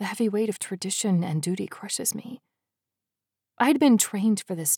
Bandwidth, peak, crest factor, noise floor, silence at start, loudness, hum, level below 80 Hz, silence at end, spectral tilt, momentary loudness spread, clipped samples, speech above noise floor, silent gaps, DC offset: 18.5 kHz; -8 dBFS; 18 dB; -88 dBFS; 0 s; -25 LUFS; none; -88 dBFS; 0 s; -4 dB/octave; 11 LU; under 0.1%; 64 dB; none; under 0.1%